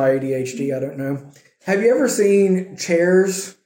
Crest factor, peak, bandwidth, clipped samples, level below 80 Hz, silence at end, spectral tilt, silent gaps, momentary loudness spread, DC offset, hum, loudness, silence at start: 14 dB; -6 dBFS; 16.5 kHz; under 0.1%; -70 dBFS; 0.15 s; -5.5 dB/octave; none; 11 LU; under 0.1%; none; -18 LUFS; 0 s